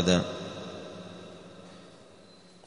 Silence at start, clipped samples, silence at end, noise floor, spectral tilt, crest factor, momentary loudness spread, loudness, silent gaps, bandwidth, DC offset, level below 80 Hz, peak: 0 s; under 0.1%; 0.1 s; -54 dBFS; -5 dB/octave; 26 dB; 25 LU; -34 LUFS; none; 10.5 kHz; under 0.1%; -60 dBFS; -8 dBFS